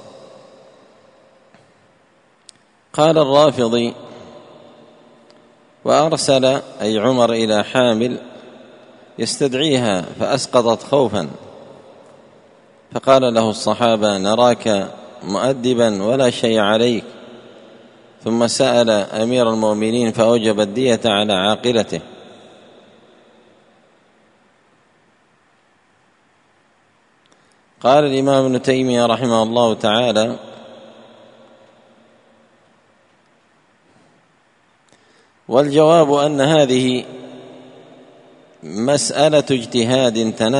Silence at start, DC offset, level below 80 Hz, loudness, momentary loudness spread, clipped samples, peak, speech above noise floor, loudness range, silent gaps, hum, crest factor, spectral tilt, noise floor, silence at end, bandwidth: 0.05 s; under 0.1%; -60 dBFS; -16 LUFS; 14 LU; under 0.1%; 0 dBFS; 42 dB; 5 LU; none; none; 18 dB; -4.5 dB/octave; -57 dBFS; 0 s; 10.5 kHz